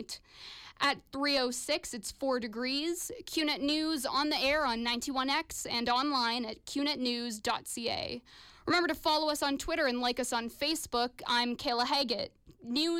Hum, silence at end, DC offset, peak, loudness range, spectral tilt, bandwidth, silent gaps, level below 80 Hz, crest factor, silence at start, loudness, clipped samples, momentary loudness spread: none; 0 s; under 0.1%; -20 dBFS; 2 LU; -2 dB/octave; 17 kHz; none; -60 dBFS; 14 dB; 0 s; -32 LUFS; under 0.1%; 8 LU